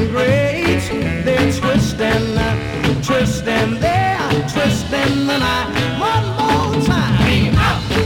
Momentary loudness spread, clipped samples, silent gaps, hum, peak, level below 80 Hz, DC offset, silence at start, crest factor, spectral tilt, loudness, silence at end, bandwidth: 4 LU; under 0.1%; none; none; -2 dBFS; -30 dBFS; under 0.1%; 0 s; 12 dB; -5.5 dB/octave; -16 LUFS; 0 s; 18 kHz